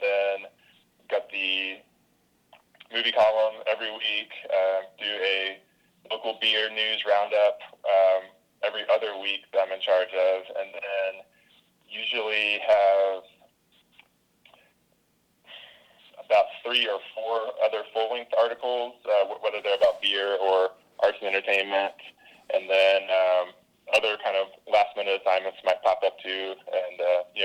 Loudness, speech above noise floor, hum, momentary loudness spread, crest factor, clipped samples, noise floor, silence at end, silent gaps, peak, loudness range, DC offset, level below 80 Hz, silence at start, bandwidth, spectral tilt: -25 LUFS; 43 dB; none; 10 LU; 16 dB; under 0.1%; -68 dBFS; 0 s; none; -12 dBFS; 4 LU; under 0.1%; -74 dBFS; 0 s; 10 kHz; -1.5 dB/octave